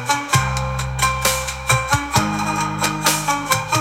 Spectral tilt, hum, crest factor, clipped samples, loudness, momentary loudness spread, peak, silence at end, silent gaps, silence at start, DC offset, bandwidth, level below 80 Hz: -3 dB/octave; none; 18 dB; under 0.1%; -19 LUFS; 4 LU; -2 dBFS; 0 s; none; 0 s; under 0.1%; 18 kHz; -34 dBFS